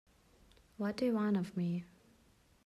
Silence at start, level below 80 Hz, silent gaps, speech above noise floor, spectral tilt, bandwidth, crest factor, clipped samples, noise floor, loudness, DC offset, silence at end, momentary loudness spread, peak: 0.8 s; -72 dBFS; none; 33 dB; -8 dB/octave; 12.5 kHz; 14 dB; under 0.1%; -68 dBFS; -36 LUFS; under 0.1%; 0.8 s; 9 LU; -24 dBFS